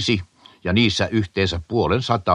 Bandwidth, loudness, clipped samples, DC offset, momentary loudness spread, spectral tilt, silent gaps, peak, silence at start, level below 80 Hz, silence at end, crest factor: 10.5 kHz; -21 LUFS; under 0.1%; under 0.1%; 5 LU; -5.5 dB/octave; none; -2 dBFS; 0 s; -42 dBFS; 0 s; 18 dB